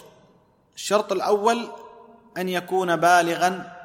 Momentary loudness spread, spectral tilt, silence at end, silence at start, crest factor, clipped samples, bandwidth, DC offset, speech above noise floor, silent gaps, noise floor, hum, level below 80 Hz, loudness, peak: 16 LU; -4 dB/octave; 0 s; 0.75 s; 20 dB; under 0.1%; 16.5 kHz; under 0.1%; 37 dB; none; -59 dBFS; none; -72 dBFS; -22 LUFS; -4 dBFS